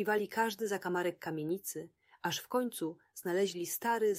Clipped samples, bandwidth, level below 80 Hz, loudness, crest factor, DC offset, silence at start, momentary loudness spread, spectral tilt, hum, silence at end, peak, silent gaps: under 0.1%; 16 kHz; -82 dBFS; -36 LUFS; 18 dB; under 0.1%; 0 s; 9 LU; -4 dB/octave; none; 0 s; -18 dBFS; none